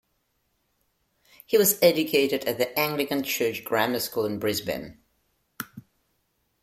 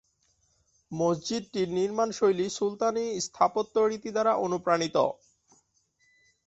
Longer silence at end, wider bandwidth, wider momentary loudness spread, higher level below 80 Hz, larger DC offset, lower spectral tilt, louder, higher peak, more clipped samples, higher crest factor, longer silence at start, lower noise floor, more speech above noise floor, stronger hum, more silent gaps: second, 0.8 s vs 1.35 s; first, 16.5 kHz vs 8.2 kHz; first, 19 LU vs 5 LU; about the same, -64 dBFS vs -68 dBFS; neither; second, -3 dB/octave vs -4.5 dB/octave; first, -24 LUFS vs -28 LUFS; about the same, -6 dBFS vs -8 dBFS; neither; about the same, 22 dB vs 20 dB; first, 1.5 s vs 0.9 s; about the same, -73 dBFS vs -70 dBFS; first, 49 dB vs 43 dB; neither; neither